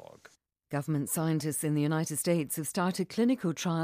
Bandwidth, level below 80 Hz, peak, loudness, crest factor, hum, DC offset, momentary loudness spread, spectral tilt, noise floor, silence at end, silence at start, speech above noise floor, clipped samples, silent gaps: 15.5 kHz; -72 dBFS; -16 dBFS; -30 LUFS; 14 dB; none; under 0.1%; 4 LU; -5.5 dB/octave; -61 dBFS; 0 s; 0.7 s; 31 dB; under 0.1%; none